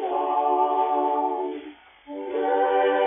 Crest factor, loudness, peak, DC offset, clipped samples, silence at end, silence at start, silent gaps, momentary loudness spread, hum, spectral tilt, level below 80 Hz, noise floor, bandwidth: 14 dB; -24 LUFS; -10 dBFS; under 0.1%; under 0.1%; 0 s; 0 s; none; 16 LU; none; -0.5 dB/octave; -68 dBFS; -44 dBFS; 3.7 kHz